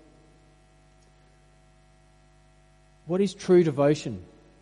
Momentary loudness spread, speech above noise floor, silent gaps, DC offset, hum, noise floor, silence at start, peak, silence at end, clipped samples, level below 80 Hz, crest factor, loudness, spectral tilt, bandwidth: 15 LU; 35 dB; none; under 0.1%; 50 Hz at -55 dBFS; -58 dBFS; 3.05 s; -10 dBFS; 0.4 s; under 0.1%; -60 dBFS; 20 dB; -24 LUFS; -7 dB/octave; 10.5 kHz